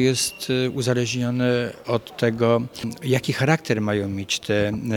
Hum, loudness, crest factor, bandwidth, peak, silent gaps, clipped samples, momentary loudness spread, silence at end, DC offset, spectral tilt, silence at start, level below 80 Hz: none; -23 LUFS; 20 dB; 17.5 kHz; -2 dBFS; none; under 0.1%; 5 LU; 0 s; under 0.1%; -5 dB/octave; 0 s; -56 dBFS